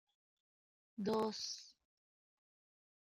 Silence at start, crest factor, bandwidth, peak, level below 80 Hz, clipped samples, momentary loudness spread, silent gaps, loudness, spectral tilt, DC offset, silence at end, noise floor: 1 s; 20 dB; 14.5 kHz; -28 dBFS; -84 dBFS; under 0.1%; 19 LU; none; -41 LUFS; -4 dB/octave; under 0.1%; 1.3 s; under -90 dBFS